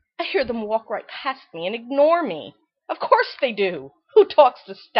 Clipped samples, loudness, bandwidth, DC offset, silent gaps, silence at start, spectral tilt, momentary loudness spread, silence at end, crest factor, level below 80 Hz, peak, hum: under 0.1%; -21 LUFS; 5.8 kHz; under 0.1%; none; 0.2 s; -7.5 dB/octave; 16 LU; 0 s; 20 dB; -62 dBFS; -2 dBFS; none